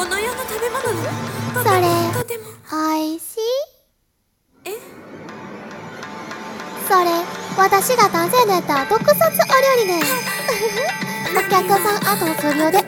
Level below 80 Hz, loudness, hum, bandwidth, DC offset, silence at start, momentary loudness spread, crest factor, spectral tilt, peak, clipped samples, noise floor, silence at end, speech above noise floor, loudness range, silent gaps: -56 dBFS; -18 LUFS; none; 17 kHz; under 0.1%; 0 s; 18 LU; 18 dB; -3.5 dB/octave; 0 dBFS; under 0.1%; -67 dBFS; 0 s; 50 dB; 12 LU; none